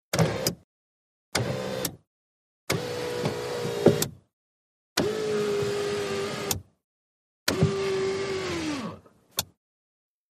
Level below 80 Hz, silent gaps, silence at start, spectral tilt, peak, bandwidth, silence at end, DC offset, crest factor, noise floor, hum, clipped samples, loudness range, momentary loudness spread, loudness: -56 dBFS; 0.64-1.32 s, 2.07-2.67 s, 4.33-4.96 s, 6.84-7.46 s; 0.15 s; -4.5 dB/octave; -4 dBFS; 15.5 kHz; 0.85 s; under 0.1%; 26 dB; under -90 dBFS; none; under 0.1%; 3 LU; 8 LU; -28 LUFS